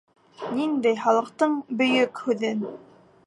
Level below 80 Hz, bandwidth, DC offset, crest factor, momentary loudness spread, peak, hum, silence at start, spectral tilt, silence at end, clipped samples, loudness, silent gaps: -76 dBFS; 11.5 kHz; under 0.1%; 18 dB; 10 LU; -8 dBFS; none; 0.4 s; -5 dB/octave; 0.5 s; under 0.1%; -24 LUFS; none